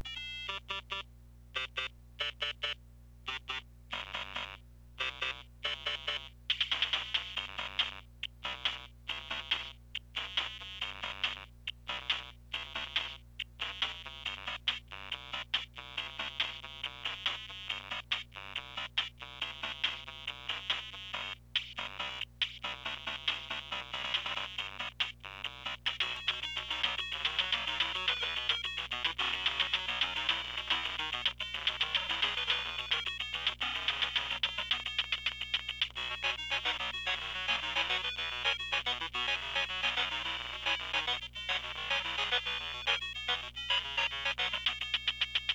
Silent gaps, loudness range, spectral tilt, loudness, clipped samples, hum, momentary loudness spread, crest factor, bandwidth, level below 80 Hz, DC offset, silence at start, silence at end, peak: none; 6 LU; -1 dB/octave; -34 LUFS; under 0.1%; 60 Hz at -55 dBFS; 9 LU; 20 dB; over 20 kHz; -56 dBFS; under 0.1%; 0 s; 0 s; -16 dBFS